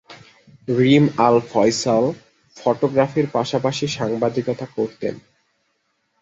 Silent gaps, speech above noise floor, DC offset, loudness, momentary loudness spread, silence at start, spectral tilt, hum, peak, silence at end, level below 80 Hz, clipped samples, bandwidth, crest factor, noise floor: none; 51 dB; under 0.1%; -19 LUFS; 11 LU; 0.1 s; -6 dB/octave; none; 0 dBFS; 1 s; -58 dBFS; under 0.1%; 8 kHz; 20 dB; -69 dBFS